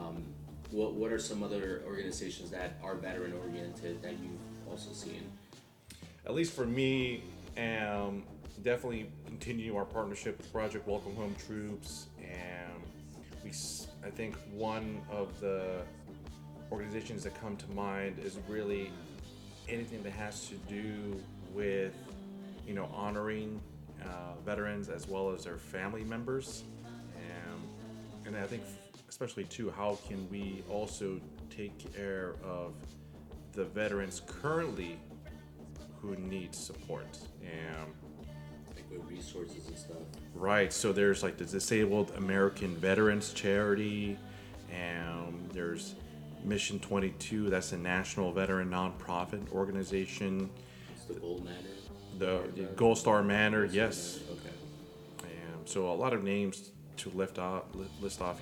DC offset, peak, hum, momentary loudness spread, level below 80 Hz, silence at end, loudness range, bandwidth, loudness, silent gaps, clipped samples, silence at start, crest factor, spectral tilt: under 0.1%; -12 dBFS; none; 18 LU; -56 dBFS; 0 s; 11 LU; 19 kHz; -37 LUFS; none; under 0.1%; 0 s; 24 dB; -5 dB/octave